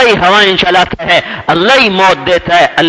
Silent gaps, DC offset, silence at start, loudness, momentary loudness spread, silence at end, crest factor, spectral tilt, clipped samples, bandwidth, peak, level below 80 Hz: none; under 0.1%; 0 s; -8 LUFS; 5 LU; 0 s; 8 dB; -4 dB/octave; 3%; 11 kHz; 0 dBFS; -38 dBFS